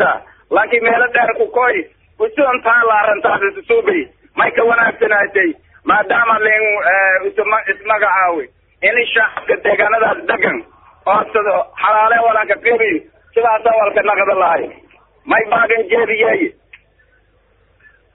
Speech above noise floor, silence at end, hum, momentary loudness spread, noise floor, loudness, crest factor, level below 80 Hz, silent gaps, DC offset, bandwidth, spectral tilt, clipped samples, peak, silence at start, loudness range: 41 dB; 1.65 s; none; 8 LU; -55 dBFS; -14 LUFS; 14 dB; -54 dBFS; none; under 0.1%; 4.1 kHz; -1 dB/octave; under 0.1%; 0 dBFS; 0 s; 2 LU